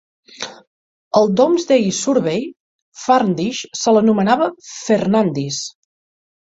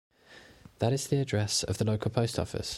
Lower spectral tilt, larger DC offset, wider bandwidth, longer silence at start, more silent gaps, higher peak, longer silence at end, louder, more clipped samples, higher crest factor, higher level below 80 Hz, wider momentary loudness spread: about the same, -5 dB/octave vs -5 dB/octave; neither; second, 8 kHz vs 13.5 kHz; about the same, 0.4 s vs 0.3 s; first, 0.67-1.11 s, 2.60-2.92 s vs none; first, -2 dBFS vs -12 dBFS; first, 0.8 s vs 0 s; first, -17 LUFS vs -30 LUFS; neither; about the same, 16 dB vs 18 dB; second, -60 dBFS vs -54 dBFS; first, 17 LU vs 3 LU